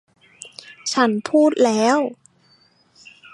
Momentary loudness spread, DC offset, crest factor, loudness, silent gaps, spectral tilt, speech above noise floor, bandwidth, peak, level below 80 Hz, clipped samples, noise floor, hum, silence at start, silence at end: 22 LU; under 0.1%; 18 dB; -18 LUFS; none; -4 dB/octave; 40 dB; 11.5 kHz; -4 dBFS; -74 dBFS; under 0.1%; -57 dBFS; none; 0.4 s; 1.2 s